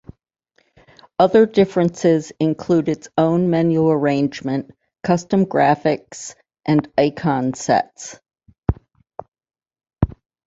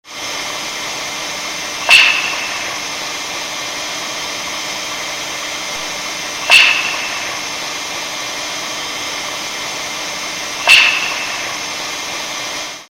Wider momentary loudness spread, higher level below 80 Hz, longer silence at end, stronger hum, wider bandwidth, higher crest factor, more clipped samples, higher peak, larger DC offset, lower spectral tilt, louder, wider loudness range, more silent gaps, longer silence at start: first, 17 LU vs 14 LU; first, -40 dBFS vs -54 dBFS; first, 0.4 s vs 0.05 s; neither; second, 8 kHz vs 17 kHz; about the same, 18 dB vs 18 dB; neither; about the same, -2 dBFS vs 0 dBFS; neither; first, -6.5 dB/octave vs 0.5 dB/octave; second, -19 LUFS vs -15 LUFS; about the same, 5 LU vs 6 LU; first, 8.58-8.62 s, 9.28-9.32 s vs none; first, 1.2 s vs 0.05 s